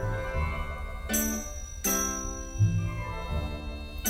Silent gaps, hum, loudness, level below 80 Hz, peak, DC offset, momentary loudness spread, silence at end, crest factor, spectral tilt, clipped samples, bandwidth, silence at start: none; none; -31 LUFS; -36 dBFS; -14 dBFS; under 0.1%; 10 LU; 0 s; 16 dB; -4 dB/octave; under 0.1%; 16.5 kHz; 0 s